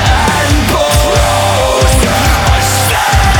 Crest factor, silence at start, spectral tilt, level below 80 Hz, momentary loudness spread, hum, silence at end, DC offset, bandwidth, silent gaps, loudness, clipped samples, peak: 8 dB; 0 s; -4 dB/octave; -16 dBFS; 1 LU; none; 0 s; under 0.1%; over 20 kHz; none; -9 LUFS; under 0.1%; 0 dBFS